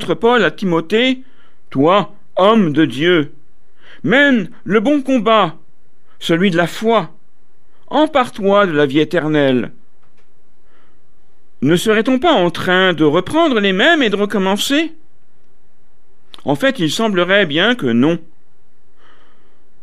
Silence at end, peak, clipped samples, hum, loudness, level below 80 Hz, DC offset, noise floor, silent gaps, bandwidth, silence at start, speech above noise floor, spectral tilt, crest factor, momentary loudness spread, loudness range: 1.65 s; 0 dBFS; under 0.1%; none; -14 LUFS; -54 dBFS; 4%; -59 dBFS; none; 14.5 kHz; 0 s; 46 dB; -5.5 dB/octave; 16 dB; 8 LU; 4 LU